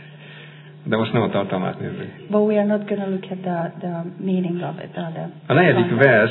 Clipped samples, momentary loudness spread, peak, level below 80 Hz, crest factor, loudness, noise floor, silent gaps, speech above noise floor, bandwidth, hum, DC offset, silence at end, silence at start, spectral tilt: under 0.1%; 18 LU; 0 dBFS; -66 dBFS; 20 dB; -21 LUFS; -41 dBFS; none; 21 dB; 4.2 kHz; none; under 0.1%; 0 s; 0 s; -10.5 dB/octave